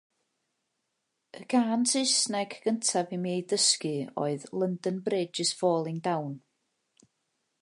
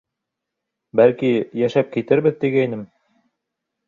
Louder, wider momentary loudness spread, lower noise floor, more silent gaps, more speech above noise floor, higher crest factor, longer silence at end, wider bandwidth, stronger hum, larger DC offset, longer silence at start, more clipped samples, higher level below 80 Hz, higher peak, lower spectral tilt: second, -28 LUFS vs -19 LUFS; about the same, 9 LU vs 8 LU; about the same, -81 dBFS vs -82 dBFS; neither; second, 52 dB vs 64 dB; about the same, 18 dB vs 18 dB; first, 1.25 s vs 1.05 s; first, 11.5 kHz vs 7.2 kHz; neither; neither; first, 1.35 s vs 0.95 s; neither; second, -82 dBFS vs -64 dBFS; second, -12 dBFS vs -2 dBFS; second, -3.5 dB/octave vs -8 dB/octave